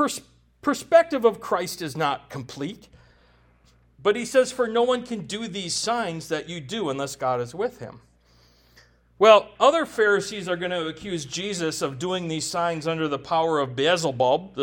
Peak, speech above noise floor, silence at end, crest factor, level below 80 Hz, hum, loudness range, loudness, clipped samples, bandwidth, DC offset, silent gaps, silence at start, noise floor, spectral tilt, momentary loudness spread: -2 dBFS; 35 dB; 0 s; 24 dB; -60 dBFS; none; 6 LU; -24 LUFS; under 0.1%; 17.5 kHz; under 0.1%; none; 0 s; -59 dBFS; -4 dB/octave; 12 LU